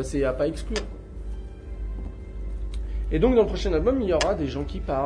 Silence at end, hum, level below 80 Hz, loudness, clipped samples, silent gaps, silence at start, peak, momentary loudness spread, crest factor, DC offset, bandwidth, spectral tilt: 0 s; none; -32 dBFS; -26 LUFS; under 0.1%; none; 0 s; -6 dBFS; 17 LU; 18 dB; under 0.1%; 10.5 kHz; -6 dB/octave